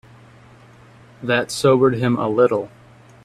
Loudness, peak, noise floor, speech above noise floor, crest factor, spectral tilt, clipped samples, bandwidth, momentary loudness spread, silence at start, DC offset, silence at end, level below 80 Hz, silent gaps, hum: -18 LUFS; -2 dBFS; -46 dBFS; 29 dB; 18 dB; -6 dB/octave; under 0.1%; 13.5 kHz; 12 LU; 1.2 s; under 0.1%; 0.55 s; -56 dBFS; none; none